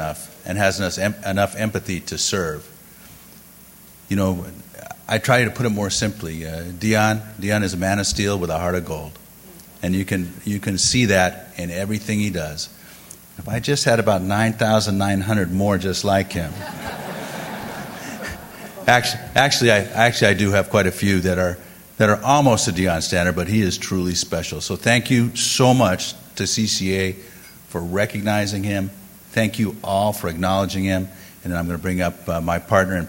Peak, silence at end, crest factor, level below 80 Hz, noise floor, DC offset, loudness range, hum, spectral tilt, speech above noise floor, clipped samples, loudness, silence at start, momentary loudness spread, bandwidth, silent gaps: 0 dBFS; 0 s; 20 dB; -46 dBFS; -45 dBFS; under 0.1%; 6 LU; none; -4.5 dB/octave; 25 dB; under 0.1%; -20 LUFS; 0 s; 14 LU; 16.5 kHz; none